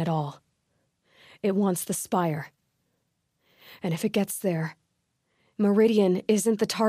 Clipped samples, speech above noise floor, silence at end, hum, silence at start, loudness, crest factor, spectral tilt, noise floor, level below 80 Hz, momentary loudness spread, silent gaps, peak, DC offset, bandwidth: under 0.1%; 51 dB; 0 s; none; 0 s; -26 LUFS; 18 dB; -5.5 dB/octave; -76 dBFS; -72 dBFS; 14 LU; none; -10 dBFS; under 0.1%; 15.5 kHz